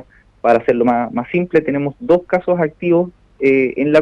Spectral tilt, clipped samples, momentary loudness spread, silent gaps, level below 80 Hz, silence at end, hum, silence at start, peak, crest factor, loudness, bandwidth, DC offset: -8.5 dB/octave; under 0.1%; 6 LU; none; -50 dBFS; 0 s; none; 0.45 s; -2 dBFS; 12 dB; -16 LUFS; 7.6 kHz; under 0.1%